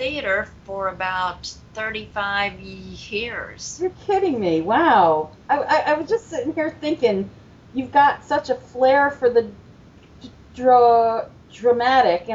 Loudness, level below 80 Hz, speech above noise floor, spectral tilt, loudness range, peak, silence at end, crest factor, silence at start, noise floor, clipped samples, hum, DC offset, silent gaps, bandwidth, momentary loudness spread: -20 LUFS; -52 dBFS; 27 dB; -4.5 dB/octave; 6 LU; -4 dBFS; 0 s; 16 dB; 0 s; -47 dBFS; under 0.1%; none; under 0.1%; none; 7.8 kHz; 15 LU